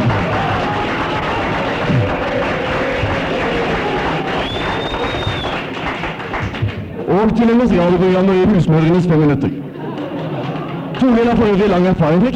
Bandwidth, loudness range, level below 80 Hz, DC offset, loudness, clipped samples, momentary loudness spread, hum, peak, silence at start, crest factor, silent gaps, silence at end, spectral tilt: 9.4 kHz; 5 LU; -34 dBFS; under 0.1%; -16 LUFS; under 0.1%; 10 LU; none; -4 dBFS; 0 s; 12 dB; none; 0 s; -7.5 dB/octave